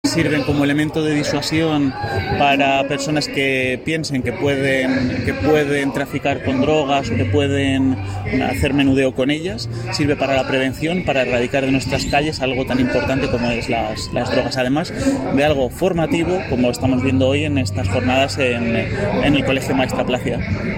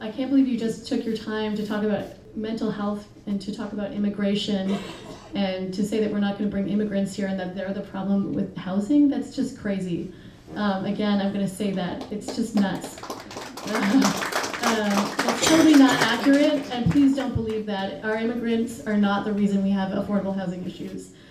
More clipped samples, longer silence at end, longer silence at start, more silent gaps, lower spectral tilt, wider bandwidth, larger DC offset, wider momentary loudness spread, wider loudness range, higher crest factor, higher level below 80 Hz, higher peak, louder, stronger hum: neither; about the same, 0 s vs 0 s; about the same, 0.05 s vs 0 s; neither; about the same, -5.5 dB/octave vs -5 dB/octave; about the same, 16.5 kHz vs 15.5 kHz; neither; second, 4 LU vs 12 LU; second, 1 LU vs 8 LU; about the same, 16 dB vs 20 dB; first, -38 dBFS vs -52 dBFS; about the same, -2 dBFS vs -4 dBFS; first, -18 LUFS vs -24 LUFS; neither